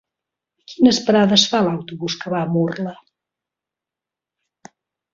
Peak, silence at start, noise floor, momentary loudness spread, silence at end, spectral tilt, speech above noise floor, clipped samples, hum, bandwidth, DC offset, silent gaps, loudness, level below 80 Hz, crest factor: 0 dBFS; 0.7 s; -87 dBFS; 12 LU; 2.2 s; -4.5 dB/octave; 70 dB; under 0.1%; none; 7.6 kHz; under 0.1%; none; -17 LUFS; -60 dBFS; 20 dB